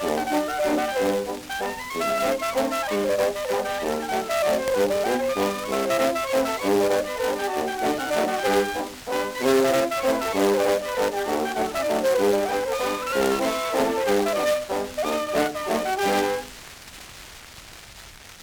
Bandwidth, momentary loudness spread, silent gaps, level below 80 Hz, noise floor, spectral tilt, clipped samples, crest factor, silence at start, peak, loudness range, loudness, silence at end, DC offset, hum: over 20 kHz; 9 LU; none; -52 dBFS; -44 dBFS; -3.5 dB/octave; under 0.1%; 16 dB; 0 s; -8 dBFS; 2 LU; -24 LUFS; 0 s; under 0.1%; none